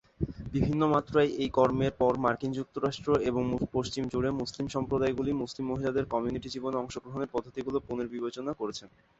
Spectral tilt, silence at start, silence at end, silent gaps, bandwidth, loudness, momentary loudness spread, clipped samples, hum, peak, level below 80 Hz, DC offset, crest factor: -6.5 dB/octave; 0.2 s; 0.3 s; none; 8 kHz; -31 LUFS; 9 LU; under 0.1%; none; -10 dBFS; -50 dBFS; under 0.1%; 20 dB